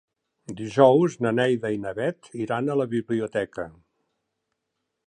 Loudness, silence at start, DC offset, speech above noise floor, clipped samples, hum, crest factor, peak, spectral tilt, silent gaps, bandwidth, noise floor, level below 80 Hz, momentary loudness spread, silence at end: -24 LUFS; 0.5 s; under 0.1%; 57 dB; under 0.1%; none; 22 dB; -4 dBFS; -7 dB/octave; none; 10 kHz; -80 dBFS; -64 dBFS; 17 LU; 1.35 s